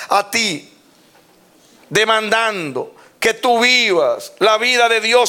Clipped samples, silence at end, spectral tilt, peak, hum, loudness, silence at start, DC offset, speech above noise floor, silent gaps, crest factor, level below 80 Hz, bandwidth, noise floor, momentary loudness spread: under 0.1%; 0 s; -2 dB/octave; 0 dBFS; none; -15 LUFS; 0 s; under 0.1%; 35 dB; none; 16 dB; -62 dBFS; 18 kHz; -51 dBFS; 12 LU